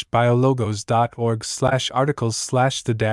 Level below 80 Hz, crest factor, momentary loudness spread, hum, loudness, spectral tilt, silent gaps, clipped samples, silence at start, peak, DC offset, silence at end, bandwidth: -52 dBFS; 16 dB; 5 LU; none; -20 LUFS; -5 dB/octave; none; under 0.1%; 0 s; -4 dBFS; under 0.1%; 0 s; 12 kHz